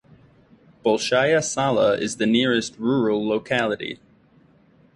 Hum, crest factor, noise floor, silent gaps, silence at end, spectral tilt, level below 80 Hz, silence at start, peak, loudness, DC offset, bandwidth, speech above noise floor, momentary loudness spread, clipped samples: none; 18 dB; -56 dBFS; none; 1 s; -4 dB/octave; -60 dBFS; 0.85 s; -4 dBFS; -21 LUFS; under 0.1%; 11.5 kHz; 35 dB; 7 LU; under 0.1%